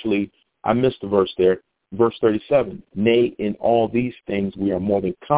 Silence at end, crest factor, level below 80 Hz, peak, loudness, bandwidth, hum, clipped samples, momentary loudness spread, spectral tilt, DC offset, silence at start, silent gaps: 0 s; 18 dB; -50 dBFS; -2 dBFS; -21 LUFS; 4 kHz; none; under 0.1%; 8 LU; -11 dB/octave; under 0.1%; 0 s; none